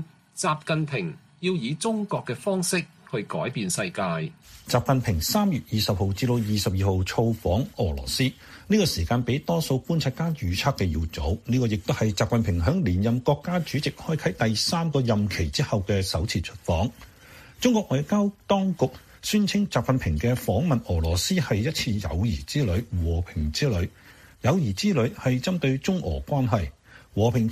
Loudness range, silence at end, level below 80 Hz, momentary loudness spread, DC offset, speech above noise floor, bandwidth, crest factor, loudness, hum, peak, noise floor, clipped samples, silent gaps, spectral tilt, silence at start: 2 LU; 0 s; -40 dBFS; 5 LU; under 0.1%; 24 dB; 15.5 kHz; 18 dB; -25 LUFS; none; -8 dBFS; -49 dBFS; under 0.1%; none; -5.5 dB/octave; 0 s